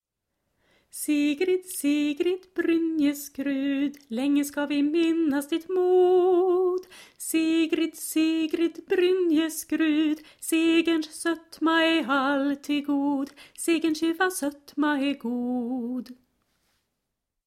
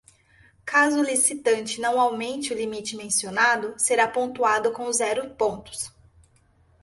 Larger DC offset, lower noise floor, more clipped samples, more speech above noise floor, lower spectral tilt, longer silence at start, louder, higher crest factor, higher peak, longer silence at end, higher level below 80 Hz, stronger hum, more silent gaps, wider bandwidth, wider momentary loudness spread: neither; first, -82 dBFS vs -60 dBFS; neither; first, 57 dB vs 37 dB; first, -3 dB/octave vs -1.5 dB/octave; first, 0.95 s vs 0.65 s; about the same, -25 LUFS vs -23 LUFS; about the same, 14 dB vs 18 dB; about the same, -10 dBFS vs -8 dBFS; first, 1.35 s vs 0.95 s; second, -70 dBFS vs -62 dBFS; neither; neither; first, 15.5 kHz vs 12 kHz; second, 8 LU vs 11 LU